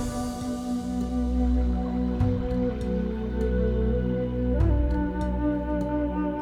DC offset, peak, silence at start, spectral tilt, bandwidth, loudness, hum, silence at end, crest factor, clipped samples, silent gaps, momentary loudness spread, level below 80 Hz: under 0.1%; -10 dBFS; 0 s; -8 dB/octave; 11.5 kHz; -27 LUFS; none; 0 s; 14 dB; under 0.1%; none; 5 LU; -30 dBFS